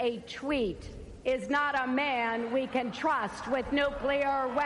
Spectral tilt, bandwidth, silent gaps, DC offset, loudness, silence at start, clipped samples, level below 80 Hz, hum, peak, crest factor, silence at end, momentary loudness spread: -5 dB/octave; 11.5 kHz; none; under 0.1%; -30 LUFS; 0 s; under 0.1%; -52 dBFS; none; -14 dBFS; 16 dB; 0 s; 6 LU